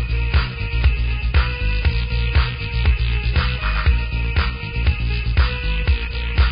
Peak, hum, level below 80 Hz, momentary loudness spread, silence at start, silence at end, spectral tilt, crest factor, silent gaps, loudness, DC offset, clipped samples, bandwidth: -4 dBFS; none; -20 dBFS; 3 LU; 0 s; 0 s; -10.5 dB/octave; 14 dB; none; -21 LUFS; under 0.1%; under 0.1%; 5.2 kHz